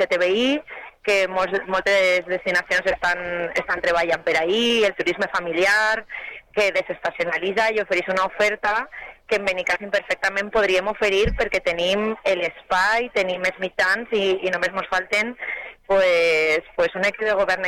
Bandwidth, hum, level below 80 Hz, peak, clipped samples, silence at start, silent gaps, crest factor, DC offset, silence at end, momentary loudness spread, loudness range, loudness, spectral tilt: 16 kHz; none; -44 dBFS; -8 dBFS; under 0.1%; 0 s; none; 12 dB; under 0.1%; 0 s; 7 LU; 2 LU; -21 LUFS; -3.5 dB/octave